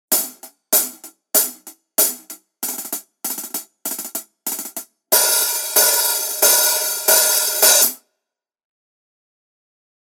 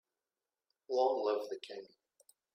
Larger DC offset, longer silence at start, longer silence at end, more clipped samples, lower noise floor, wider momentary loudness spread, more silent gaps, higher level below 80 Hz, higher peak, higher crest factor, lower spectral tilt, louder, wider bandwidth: neither; second, 0.1 s vs 0.9 s; first, 2.05 s vs 0.7 s; neither; second, -82 dBFS vs under -90 dBFS; about the same, 15 LU vs 16 LU; neither; first, -78 dBFS vs under -90 dBFS; first, 0 dBFS vs -20 dBFS; about the same, 20 dB vs 20 dB; second, 2 dB/octave vs -3.5 dB/octave; first, -16 LUFS vs -35 LUFS; first, over 20 kHz vs 15 kHz